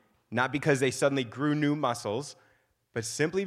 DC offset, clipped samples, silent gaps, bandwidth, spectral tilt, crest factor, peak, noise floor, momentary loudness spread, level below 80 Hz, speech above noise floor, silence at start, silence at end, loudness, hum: under 0.1%; under 0.1%; none; 14.5 kHz; -5 dB/octave; 20 dB; -10 dBFS; -68 dBFS; 10 LU; -68 dBFS; 40 dB; 0.3 s; 0 s; -29 LUFS; none